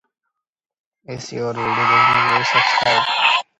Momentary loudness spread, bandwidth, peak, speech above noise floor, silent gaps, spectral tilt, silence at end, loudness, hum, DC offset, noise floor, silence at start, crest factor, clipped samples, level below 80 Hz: 15 LU; 11 kHz; -2 dBFS; 68 dB; none; -3 dB/octave; 0.15 s; -15 LUFS; none; under 0.1%; -85 dBFS; 1.1 s; 18 dB; under 0.1%; -58 dBFS